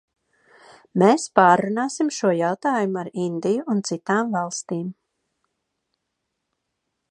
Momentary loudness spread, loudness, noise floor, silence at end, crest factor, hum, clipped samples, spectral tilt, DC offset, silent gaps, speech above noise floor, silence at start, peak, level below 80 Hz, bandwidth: 11 LU; -21 LUFS; -79 dBFS; 2.2 s; 22 dB; none; under 0.1%; -5.5 dB/octave; under 0.1%; none; 58 dB; 0.95 s; 0 dBFS; -72 dBFS; 11 kHz